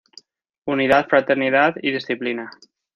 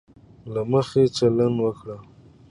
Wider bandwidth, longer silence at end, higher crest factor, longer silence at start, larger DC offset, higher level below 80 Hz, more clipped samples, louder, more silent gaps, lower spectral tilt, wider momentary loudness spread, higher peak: second, 7.6 kHz vs 11 kHz; about the same, 0.45 s vs 0.5 s; about the same, 18 dB vs 18 dB; first, 0.65 s vs 0.45 s; neither; second, -62 dBFS vs -56 dBFS; neither; first, -19 LUFS vs -22 LUFS; neither; about the same, -6 dB/octave vs -7 dB/octave; second, 14 LU vs 18 LU; first, -2 dBFS vs -6 dBFS